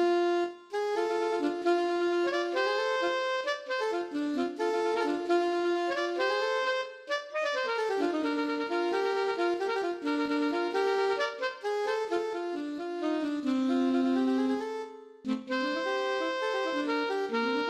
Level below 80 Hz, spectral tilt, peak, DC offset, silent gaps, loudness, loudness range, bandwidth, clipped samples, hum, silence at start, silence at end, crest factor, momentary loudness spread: -76 dBFS; -3.5 dB/octave; -16 dBFS; under 0.1%; none; -30 LUFS; 1 LU; 11 kHz; under 0.1%; none; 0 s; 0 s; 14 dB; 6 LU